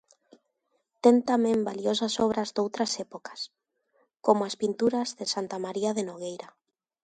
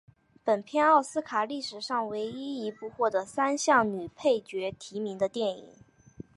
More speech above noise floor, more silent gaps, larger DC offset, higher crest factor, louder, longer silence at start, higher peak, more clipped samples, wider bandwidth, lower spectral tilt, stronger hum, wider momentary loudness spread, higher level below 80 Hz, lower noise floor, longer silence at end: first, 49 dB vs 21 dB; neither; neither; about the same, 22 dB vs 20 dB; about the same, -27 LUFS vs -29 LUFS; first, 1.05 s vs 0.45 s; first, -6 dBFS vs -10 dBFS; neither; second, 9.4 kHz vs 11.5 kHz; about the same, -4.5 dB/octave vs -3.5 dB/octave; neither; first, 15 LU vs 12 LU; about the same, -70 dBFS vs -70 dBFS; first, -76 dBFS vs -50 dBFS; first, 0.55 s vs 0.15 s